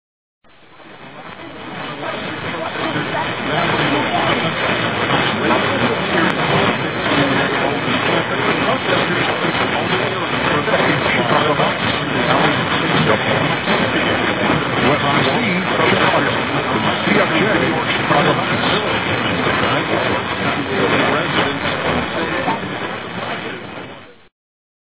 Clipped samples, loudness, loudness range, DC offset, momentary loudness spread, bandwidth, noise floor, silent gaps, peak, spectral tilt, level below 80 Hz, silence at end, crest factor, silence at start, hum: under 0.1%; -16 LUFS; 4 LU; 0.4%; 9 LU; 4 kHz; -43 dBFS; none; 0 dBFS; -9 dB/octave; -44 dBFS; 0.7 s; 18 dB; 0.8 s; none